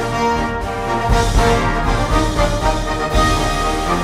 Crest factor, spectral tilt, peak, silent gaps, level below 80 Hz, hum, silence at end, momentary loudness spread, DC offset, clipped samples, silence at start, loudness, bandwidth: 14 dB; -5 dB/octave; -2 dBFS; none; -22 dBFS; none; 0 s; 5 LU; under 0.1%; under 0.1%; 0 s; -17 LUFS; 15 kHz